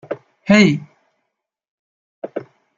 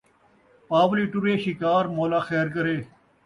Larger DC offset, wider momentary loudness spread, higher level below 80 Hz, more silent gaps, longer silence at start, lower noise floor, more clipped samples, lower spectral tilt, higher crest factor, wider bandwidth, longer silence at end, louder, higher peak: neither; first, 20 LU vs 5 LU; first, -56 dBFS vs -62 dBFS; first, 1.68-2.22 s vs none; second, 0.1 s vs 0.7 s; first, -77 dBFS vs -60 dBFS; neither; second, -6 dB/octave vs -7.5 dB/octave; about the same, 20 dB vs 16 dB; second, 7.6 kHz vs 11 kHz; about the same, 0.35 s vs 0.4 s; first, -14 LUFS vs -24 LUFS; first, -2 dBFS vs -8 dBFS